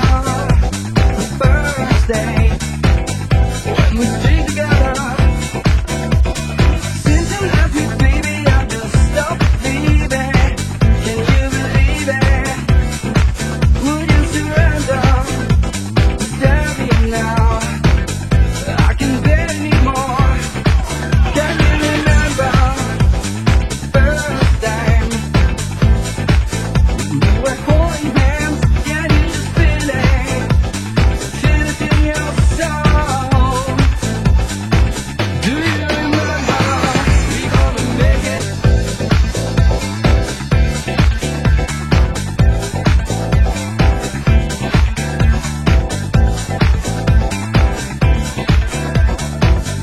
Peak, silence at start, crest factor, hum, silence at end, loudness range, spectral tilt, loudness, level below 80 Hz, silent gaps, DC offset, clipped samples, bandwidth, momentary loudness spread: 0 dBFS; 0 s; 14 dB; none; 0 s; 1 LU; -5.5 dB/octave; -15 LUFS; -16 dBFS; none; 0.7%; under 0.1%; 12.5 kHz; 3 LU